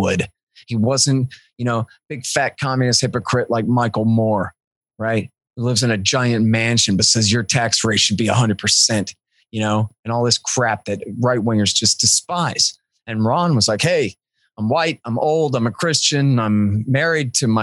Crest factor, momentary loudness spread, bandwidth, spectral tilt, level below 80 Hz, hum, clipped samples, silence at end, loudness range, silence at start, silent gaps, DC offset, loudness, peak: 16 dB; 10 LU; 12.5 kHz; -4 dB/octave; -56 dBFS; none; under 0.1%; 0 s; 4 LU; 0 s; 0.43-0.47 s, 4.67-4.81 s, 9.99-10.03 s; under 0.1%; -17 LUFS; -2 dBFS